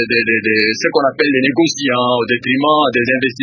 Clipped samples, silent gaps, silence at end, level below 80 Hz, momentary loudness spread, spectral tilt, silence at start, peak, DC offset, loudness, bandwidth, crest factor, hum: under 0.1%; none; 0 s; -56 dBFS; 3 LU; -4 dB/octave; 0 s; 0 dBFS; under 0.1%; -14 LUFS; 7.4 kHz; 14 dB; none